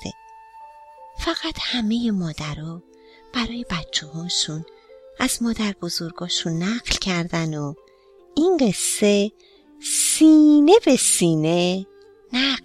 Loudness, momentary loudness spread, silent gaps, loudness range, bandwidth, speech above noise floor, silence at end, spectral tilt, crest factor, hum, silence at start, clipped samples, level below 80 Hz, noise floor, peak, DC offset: -20 LUFS; 16 LU; none; 10 LU; 14.5 kHz; 32 dB; 0.05 s; -4 dB/octave; 20 dB; none; 0 s; under 0.1%; -46 dBFS; -51 dBFS; 0 dBFS; under 0.1%